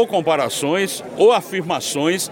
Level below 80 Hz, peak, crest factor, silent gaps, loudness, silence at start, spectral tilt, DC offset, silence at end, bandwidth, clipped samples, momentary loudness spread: -64 dBFS; -4 dBFS; 14 dB; none; -18 LUFS; 0 s; -3.5 dB/octave; under 0.1%; 0 s; 17 kHz; under 0.1%; 7 LU